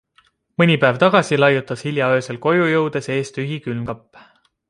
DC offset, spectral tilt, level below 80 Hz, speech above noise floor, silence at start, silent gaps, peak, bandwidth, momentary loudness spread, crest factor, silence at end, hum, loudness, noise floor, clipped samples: under 0.1%; -6 dB/octave; -58 dBFS; 41 dB; 0.6 s; none; -2 dBFS; 11.5 kHz; 12 LU; 18 dB; 0.7 s; none; -18 LUFS; -59 dBFS; under 0.1%